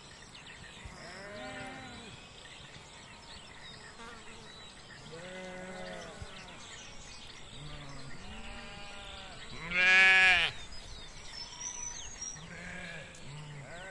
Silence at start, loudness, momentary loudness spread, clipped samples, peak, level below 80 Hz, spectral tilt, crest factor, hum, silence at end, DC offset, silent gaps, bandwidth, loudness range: 0 s; -27 LUFS; 22 LU; under 0.1%; -10 dBFS; -56 dBFS; -1.5 dB/octave; 26 dB; none; 0 s; under 0.1%; none; 11.5 kHz; 20 LU